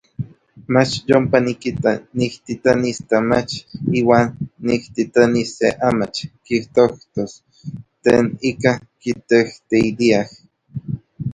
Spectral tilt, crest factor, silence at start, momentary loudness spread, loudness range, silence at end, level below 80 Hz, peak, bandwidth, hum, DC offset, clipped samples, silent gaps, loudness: -6 dB/octave; 18 dB; 0.2 s; 15 LU; 2 LU; 0 s; -50 dBFS; 0 dBFS; 10.5 kHz; none; under 0.1%; under 0.1%; none; -18 LUFS